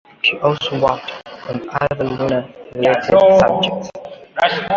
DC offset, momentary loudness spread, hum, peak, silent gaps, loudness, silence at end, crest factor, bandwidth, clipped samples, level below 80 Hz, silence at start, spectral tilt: under 0.1%; 18 LU; none; -2 dBFS; none; -16 LUFS; 0 s; 16 dB; 7.4 kHz; under 0.1%; -48 dBFS; 0.25 s; -5.5 dB/octave